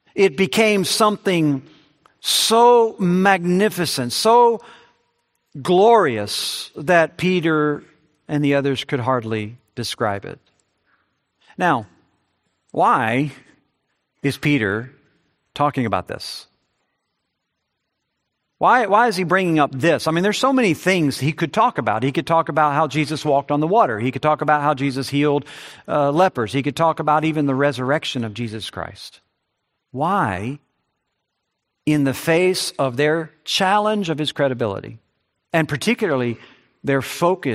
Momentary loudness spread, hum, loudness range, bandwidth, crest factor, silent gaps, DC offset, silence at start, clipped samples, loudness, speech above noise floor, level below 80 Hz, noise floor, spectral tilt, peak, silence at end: 12 LU; none; 8 LU; 15.5 kHz; 20 dB; none; under 0.1%; 0.15 s; under 0.1%; -19 LUFS; 58 dB; -62 dBFS; -76 dBFS; -5 dB/octave; 0 dBFS; 0 s